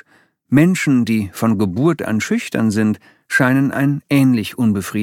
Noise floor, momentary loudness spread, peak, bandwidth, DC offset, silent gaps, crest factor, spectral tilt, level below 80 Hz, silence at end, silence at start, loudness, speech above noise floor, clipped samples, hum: -55 dBFS; 5 LU; -2 dBFS; 17 kHz; under 0.1%; none; 14 dB; -6.5 dB/octave; -56 dBFS; 0 s; 0.5 s; -16 LUFS; 40 dB; under 0.1%; none